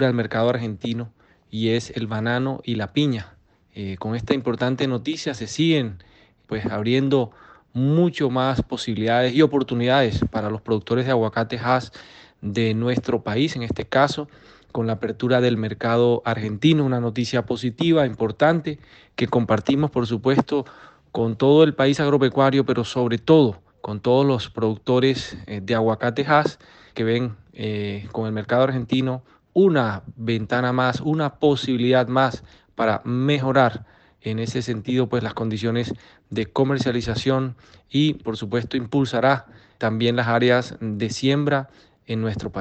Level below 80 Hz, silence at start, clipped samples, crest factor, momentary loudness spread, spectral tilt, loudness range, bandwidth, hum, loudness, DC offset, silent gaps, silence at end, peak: -50 dBFS; 0 s; under 0.1%; 18 dB; 11 LU; -6.5 dB/octave; 5 LU; 8.6 kHz; none; -22 LUFS; under 0.1%; none; 0 s; -4 dBFS